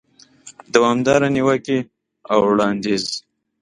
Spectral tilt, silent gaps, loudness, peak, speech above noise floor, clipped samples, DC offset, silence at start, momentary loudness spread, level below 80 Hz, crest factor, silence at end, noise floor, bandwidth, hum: -5 dB/octave; none; -18 LUFS; 0 dBFS; 29 dB; under 0.1%; under 0.1%; 0.45 s; 9 LU; -54 dBFS; 20 dB; 0.4 s; -46 dBFS; 11.5 kHz; none